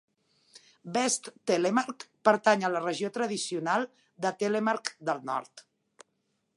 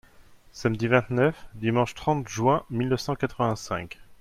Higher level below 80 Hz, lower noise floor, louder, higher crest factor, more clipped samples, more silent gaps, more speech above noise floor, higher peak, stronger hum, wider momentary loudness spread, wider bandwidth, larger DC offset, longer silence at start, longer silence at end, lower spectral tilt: second, -84 dBFS vs -52 dBFS; first, -77 dBFS vs -52 dBFS; second, -29 LUFS vs -26 LUFS; about the same, 22 dB vs 20 dB; neither; neither; first, 48 dB vs 27 dB; about the same, -8 dBFS vs -8 dBFS; neither; about the same, 9 LU vs 8 LU; second, 11.5 kHz vs 14.5 kHz; neither; first, 0.85 s vs 0.2 s; first, 0.95 s vs 0.05 s; second, -3.5 dB/octave vs -6 dB/octave